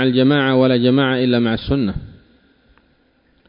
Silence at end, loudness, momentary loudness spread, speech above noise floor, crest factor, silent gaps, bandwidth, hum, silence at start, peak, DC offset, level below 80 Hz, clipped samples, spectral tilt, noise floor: 1.4 s; -16 LUFS; 6 LU; 43 dB; 14 dB; none; 5.4 kHz; none; 0 s; -4 dBFS; under 0.1%; -40 dBFS; under 0.1%; -12 dB/octave; -58 dBFS